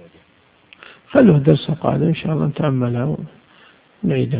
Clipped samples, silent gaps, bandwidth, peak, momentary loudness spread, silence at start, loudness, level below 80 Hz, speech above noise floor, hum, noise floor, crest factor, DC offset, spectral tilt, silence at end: under 0.1%; none; 4.8 kHz; 0 dBFS; 12 LU; 1.1 s; -17 LUFS; -48 dBFS; 38 dB; none; -54 dBFS; 18 dB; under 0.1%; -12 dB/octave; 0 s